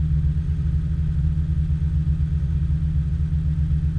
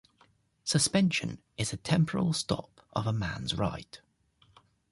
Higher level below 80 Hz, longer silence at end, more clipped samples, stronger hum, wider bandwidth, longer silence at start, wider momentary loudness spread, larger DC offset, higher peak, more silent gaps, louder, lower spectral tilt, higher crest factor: first, -24 dBFS vs -54 dBFS; second, 0 s vs 0.95 s; neither; neither; second, 3.9 kHz vs 11.5 kHz; second, 0 s vs 0.65 s; second, 1 LU vs 12 LU; neither; about the same, -12 dBFS vs -14 dBFS; neither; first, -23 LUFS vs -30 LUFS; first, -10 dB/octave vs -4.5 dB/octave; second, 10 dB vs 18 dB